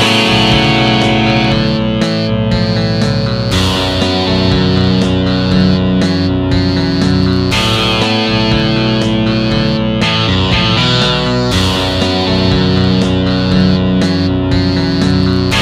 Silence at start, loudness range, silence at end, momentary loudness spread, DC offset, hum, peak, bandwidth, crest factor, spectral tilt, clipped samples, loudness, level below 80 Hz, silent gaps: 0 s; 1 LU; 0 s; 3 LU; under 0.1%; none; 0 dBFS; 14 kHz; 12 dB; -6 dB/octave; under 0.1%; -12 LUFS; -26 dBFS; none